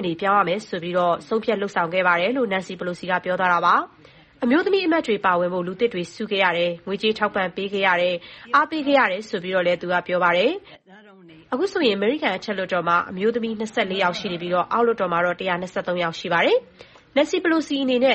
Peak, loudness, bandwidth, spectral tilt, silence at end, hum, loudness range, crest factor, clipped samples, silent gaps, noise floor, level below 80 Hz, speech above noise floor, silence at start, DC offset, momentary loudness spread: -4 dBFS; -22 LUFS; 8.4 kHz; -5 dB/octave; 0 s; none; 2 LU; 16 dB; under 0.1%; none; -48 dBFS; -62 dBFS; 26 dB; 0 s; under 0.1%; 7 LU